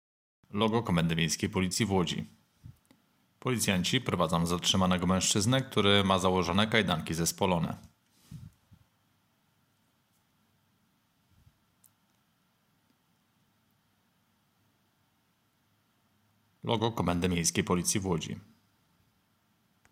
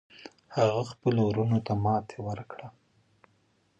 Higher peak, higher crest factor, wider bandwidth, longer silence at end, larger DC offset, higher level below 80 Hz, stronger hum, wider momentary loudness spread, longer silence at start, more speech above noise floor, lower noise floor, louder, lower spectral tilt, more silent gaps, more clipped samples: about the same, -8 dBFS vs -10 dBFS; about the same, 24 dB vs 20 dB; first, 16 kHz vs 8.2 kHz; first, 1.5 s vs 1.1 s; neither; about the same, -62 dBFS vs -58 dBFS; neither; second, 9 LU vs 20 LU; first, 0.55 s vs 0.2 s; about the same, 44 dB vs 41 dB; about the same, -72 dBFS vs -69 dBFS; about the same, -28 LUFS vs -29 LUFS; second, -4 dB/octave vs -8 dB/octave; neither; neither